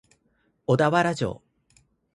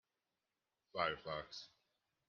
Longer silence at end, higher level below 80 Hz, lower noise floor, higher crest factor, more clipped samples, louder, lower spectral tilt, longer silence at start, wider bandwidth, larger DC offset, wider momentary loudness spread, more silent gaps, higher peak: first, 0.8 s vs 0.6 s; first, -58 dBFS vs -76 dBFS; second, -69 dBFS vs under -90 dBFS; second, 20 dB vs 26 dB; neither; first, -24 LUFS vs -44 LUFS; first, -6.5 dB/octave vs -1 dB/octave; second, 0.7 s vs 0.95 s; first, 11.5 kHz vs 7 kHz; neither; about the same, 15 LU vs 13 LU; neither; first, -8 dBFS vs -22 dBFS